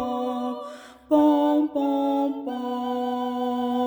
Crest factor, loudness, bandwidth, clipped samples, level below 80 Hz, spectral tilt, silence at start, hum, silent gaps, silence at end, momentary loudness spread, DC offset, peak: 18 dB; -24 LUFS; over 20 kHz; under 0.1%; -64 dBFS; -5.5 dB/octave; 0 s; none; none; 0 s; 12 LU; under 0.1%; -6 dBFS